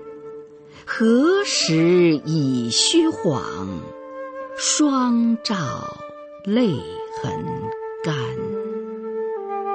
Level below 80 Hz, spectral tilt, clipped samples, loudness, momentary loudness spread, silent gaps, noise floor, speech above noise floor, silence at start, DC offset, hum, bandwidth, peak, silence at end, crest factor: -58 dBFS; -4 dB/octave; under 0.1%; -21 LUFS; 17 LU; none; -41 dBFS; 22 dB; 0 s; under 0.1%; none; 8.8 kHz; -4 dBFS; 0 s; 18 dB